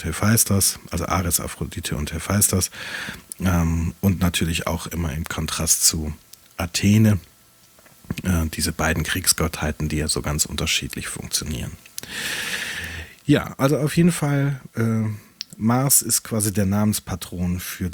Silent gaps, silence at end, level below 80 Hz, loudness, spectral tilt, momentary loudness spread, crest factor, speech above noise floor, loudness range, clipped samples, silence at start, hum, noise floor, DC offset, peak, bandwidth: none; 0 s; -40 dBFS; -21 LUFS; -4 dB/octave; 13 LU; 20 dB; 31 dB; 4 LU; under 0.1%; 0 s; none; -53 dBFS; under 0.1%; -2 dBFS; over 20 kHz